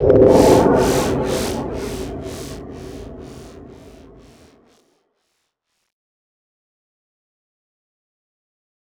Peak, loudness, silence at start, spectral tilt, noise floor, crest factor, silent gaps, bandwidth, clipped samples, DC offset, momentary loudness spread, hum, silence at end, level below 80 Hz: -2 dBFS; -16 LUFS; 0 s; -6 dB/octave; -73 dBFS; 18 dB; none; over 20 kHz; under 0.1%; under 0.1%; 25 LU; none; 5.3 s; -38 dBFS